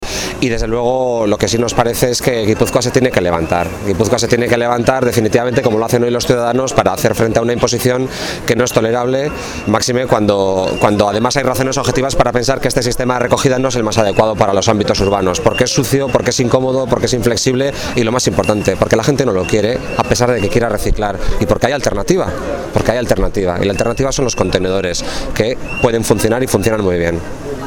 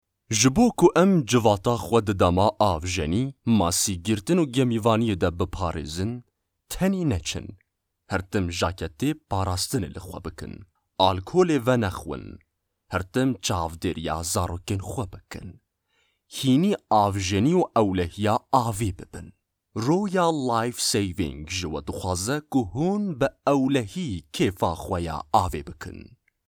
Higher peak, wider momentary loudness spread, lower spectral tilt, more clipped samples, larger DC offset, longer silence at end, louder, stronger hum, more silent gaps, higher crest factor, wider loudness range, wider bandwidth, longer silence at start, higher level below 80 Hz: first, 0 dBFS vs -4 dBFS; second, 4 LU vs 15 LU; about the same, -4.5 dB/octave vs -5 dB/octave; neither; neither; second, 0 s vs 0.4 s; first, -14 LUFS vs -24 LUFS; neither; neither; second, 14 dB vs 20 dB; second, 2 LU vs 6 LU; about the same, 19 kHz vs over 20 kHz; second, 0 s vs 0.3 s; first, -28 dBFS vs -48 dBFS